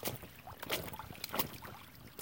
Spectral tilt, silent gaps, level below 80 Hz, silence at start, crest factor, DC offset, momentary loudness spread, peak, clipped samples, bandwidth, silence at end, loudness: -3 dB/octave; none; -62 dBFS; 0 s; 26 dB; under 0.1%; 14 LU; -18 dBFS; under 0.1%; 17 kHz; 0 s; -41 LUFS